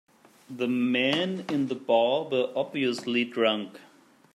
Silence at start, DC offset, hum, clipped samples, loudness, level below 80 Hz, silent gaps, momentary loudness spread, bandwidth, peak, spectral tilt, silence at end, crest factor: 0.5 s; under 0.1%; none; under 0.1%; -27 LUFS; -80 dBFS; none; 7 LU; 12.5 kHz; -10 dBFS; -5.5 dB/octave; 0.55 s; 18 dB